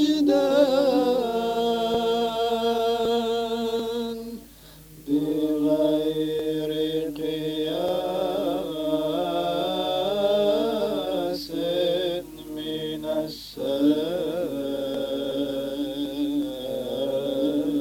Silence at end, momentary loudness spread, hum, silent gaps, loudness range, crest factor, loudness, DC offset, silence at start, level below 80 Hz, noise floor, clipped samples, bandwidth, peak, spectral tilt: 0 s; 8 LU; none; none; 4 LU; 18 dB; -25 LUFS; under 0.1%; 0 s; -54 dBFS; -47 dBFS; under 0.1%; 17 kHz; -8 dBFS; -5.5 dB/octave